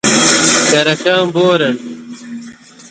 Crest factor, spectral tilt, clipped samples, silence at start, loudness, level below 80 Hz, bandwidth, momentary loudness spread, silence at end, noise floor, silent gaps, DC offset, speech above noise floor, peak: 14 dB; -2.5 dB/octave; under 0.1%; 0.05 s; -11 LUFS; -54 dBFS; 9.6 kHz; 20 LU; 0.05 s; -35 dBFS; none; under 0.1%; 22 dB; 0 dBFS